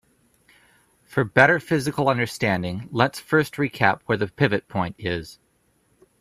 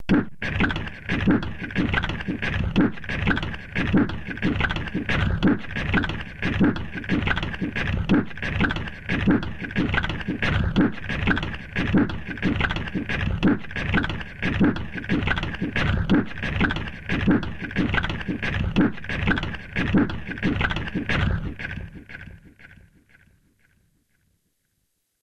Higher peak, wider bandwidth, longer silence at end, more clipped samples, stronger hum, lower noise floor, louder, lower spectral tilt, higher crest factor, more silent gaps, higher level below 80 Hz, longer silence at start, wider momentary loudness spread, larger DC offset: first, 0 dBFS vs -8 dBFS; first, 15 kHz vs 9 kHz; second, 0.85 s vs 2.5 s; neither; neither; second, -65 dBFS vs -73 dBFS; about the same, -22 LUFS vs -24 LUFS; about the same, -6 dB/octave vs -7 dB/octave; first, 24 dB vs 16 dB; neither; second, -56 dBFS vs -34 dBFS; first, 1.1 s vs 0 s; first, 12 LU vs 7 LU; neither